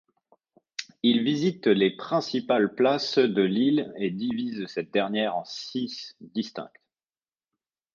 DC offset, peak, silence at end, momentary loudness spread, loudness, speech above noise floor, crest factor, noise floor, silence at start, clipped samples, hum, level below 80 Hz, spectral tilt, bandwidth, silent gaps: under 0.1%; -8 dBFS; 1.3 s; 13 LU; -26 LUFS; over 65 dB; 18 dB; under -90 dBFS; 0.8 s; under 0.1%; none; -74 dBFS; -5.5 dB/octave; 7.4 kHz; none